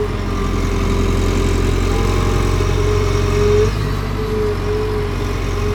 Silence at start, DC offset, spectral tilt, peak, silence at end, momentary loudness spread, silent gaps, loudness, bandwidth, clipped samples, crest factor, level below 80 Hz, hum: 0 s; under 0.1%; -6 dB/octave; -2 dBFS; 0 s; 5 LU; none; -18 LUFS; 16.5 kHz; under 0.1%; 14 dB; -20 dBFS; none